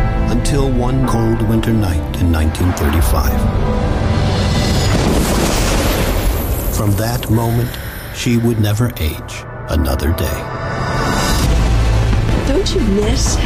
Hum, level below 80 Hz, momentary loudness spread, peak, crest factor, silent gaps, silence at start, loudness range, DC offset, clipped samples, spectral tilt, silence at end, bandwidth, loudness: none; -20 dBFS; 6 LU; -4 dBFS; 10 dB; none; 0 s; 2 LU; under 0.1%; under 0.1%; -5.5 dB/octave; 0 s; 15.5 kHz; -16 LUFS